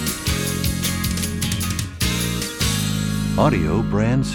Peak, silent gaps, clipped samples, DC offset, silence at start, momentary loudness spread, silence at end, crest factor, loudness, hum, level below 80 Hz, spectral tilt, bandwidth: -2 dBFS; none; under 0.1%; under 0.1%; 0 s; 4 LU; 0 s; 18 dB; -21 LUFS; none; -32 dBFS; -4.5 dB/octave; 19.5 kHz